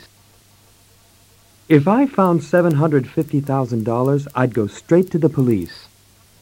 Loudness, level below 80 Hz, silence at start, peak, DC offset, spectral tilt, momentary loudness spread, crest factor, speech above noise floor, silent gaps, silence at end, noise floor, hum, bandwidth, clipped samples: -17 LUFS; -56 dBFS; 1.7 s; -2 dBFS; under 0.1%; -8.5 dB/octave; 6 LU; 18 dB; 35 dB; none; 0.6 s; -51 dBFS; none; 16.5 kHz; under 0.1%